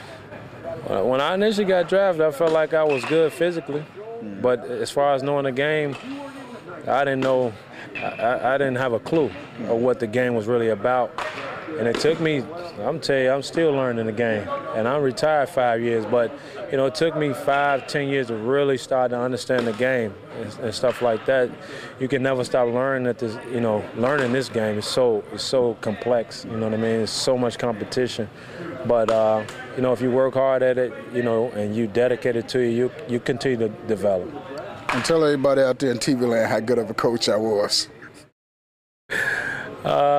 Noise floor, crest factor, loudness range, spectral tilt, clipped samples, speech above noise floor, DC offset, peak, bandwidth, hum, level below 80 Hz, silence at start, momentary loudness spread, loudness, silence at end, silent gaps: under -90 dBFS; 14 dB; 3 LU; -5 dB/octave; under 0.1%; over 68 dB; under 0.1%; -8 dBFS; 15 kHz; none; -60 dBFS; 0 s; 11 LU; -22 LUFS; 0 s; 38.32-39.09 s